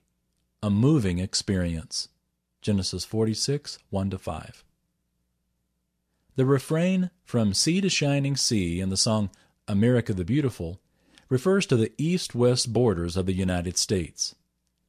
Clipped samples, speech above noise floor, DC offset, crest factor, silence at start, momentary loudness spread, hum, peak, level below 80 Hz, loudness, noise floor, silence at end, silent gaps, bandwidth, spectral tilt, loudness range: under 0.1%; 52 dB; under 0.1%; 16 dB; 0.6 s; 10 LU; none; -10 dBFS; -46 dBFS; -25 LUFS; -76 dBFS; 0.55 s; none; 14.5 kHz; -5 dB/octave; 6 LU